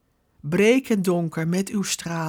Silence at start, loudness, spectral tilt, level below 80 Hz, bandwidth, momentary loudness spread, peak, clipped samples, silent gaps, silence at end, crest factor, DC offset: 0.45 s; -22 LUFS; -5 dB/octave; -62 dBFS; 18 kHz; 8 LU; -6 dBFS; under 0.1%; none; 0 s; 16 dB; under 0.1%